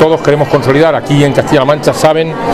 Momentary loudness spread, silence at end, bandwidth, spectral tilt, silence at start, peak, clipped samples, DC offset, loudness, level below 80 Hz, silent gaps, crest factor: 1 LU; 0 s; 14 kHz; -6 dB/octave; 0 s; 0 dBFS; 1%; 0.8%; -9 LUFS; -38 dBFS; none; 8 dB